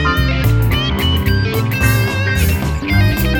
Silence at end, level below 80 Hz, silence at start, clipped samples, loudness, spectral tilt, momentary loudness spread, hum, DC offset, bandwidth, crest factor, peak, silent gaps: 0 s; -20 dBFS; 0 s; under 0.1%; -15 LUFS; -5.5 dB/octave; 2 LU; none; under 0.1%; over 20 kHz; 12 dB; -2 dBFS; none